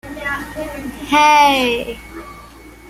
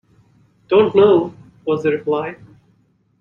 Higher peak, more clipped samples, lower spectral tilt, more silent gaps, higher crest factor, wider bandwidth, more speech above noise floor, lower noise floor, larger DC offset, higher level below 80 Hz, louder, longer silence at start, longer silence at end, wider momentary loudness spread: about the same, -2 dBFS vs -2 dBFS; neither; second, -3 dB/octave vs -8 dB/octave; neither; about the same, 16 dB vs 16 dB; first, 16 kHz vs 6.4 kHz; second, 24 dB vs 44 dB; second, -39 dBFS vs -59 dBFS; neither; first, -42 dBFS vs -58 dBFS; about the same, -14 LUFS vs -16 LUFS; second, 0.05 s vs 0.7 s; second, 0 s vs 0.85 s; first, 23 LU vs 17 LU